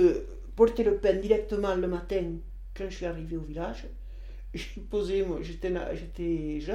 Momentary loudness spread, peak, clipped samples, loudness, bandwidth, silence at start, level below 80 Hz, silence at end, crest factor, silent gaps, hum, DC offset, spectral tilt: 17 LU; -8 dBFS; under 0.1%; -30 LUFS; 11 kHz; 0 s; -40 dBFS; 0 s; 20 dB; none; none; under 0.1%; -7 dB/octave